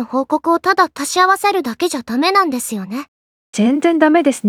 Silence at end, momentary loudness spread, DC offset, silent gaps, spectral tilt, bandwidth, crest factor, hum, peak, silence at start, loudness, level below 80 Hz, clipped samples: 0 s; 11 LU; under 0.1%; 3.08-3.53 s; -3.5 dB/octave; 17 kHz; 16 dB; none; 0 dBFS; 0 s; -15 LUFS; -64 dBFS; under 0.1%